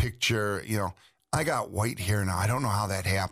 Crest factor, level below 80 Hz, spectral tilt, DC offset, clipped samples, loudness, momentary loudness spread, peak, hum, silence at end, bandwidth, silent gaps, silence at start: 14 dB; -52 dBFS; -4.5 dB/octave; under 0.1%; under 0.1%; -29 LUFS; 5 LU; -14 dBFS; none; 0 s; 15.5 kHz; none; 0 s